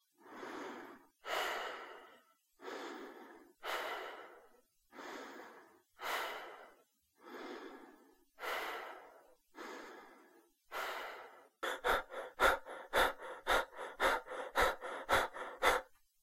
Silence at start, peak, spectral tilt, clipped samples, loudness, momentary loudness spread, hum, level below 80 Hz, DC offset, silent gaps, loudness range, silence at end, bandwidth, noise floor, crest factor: 0.2 s; -16 dBFS; -2 dB/octave; under 0.1%; -39 LUFS; 21 LU; none; -60 dBFS; under 0.1%; none; 12 LU; 0.3 s; 16 kHz; -71 dBFS; 26 dB